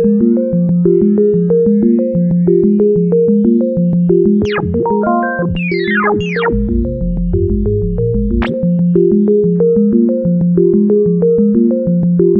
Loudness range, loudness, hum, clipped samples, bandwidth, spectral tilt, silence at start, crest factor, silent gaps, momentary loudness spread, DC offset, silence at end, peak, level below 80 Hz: 3 LU; -12 LUFS; none; under 0.1%; 5 kHz; -10 dB/octave; 0 s; 12 dB; none; 5 LU; under 0.1%; 0 s; 0 dBFS; -26 dBFS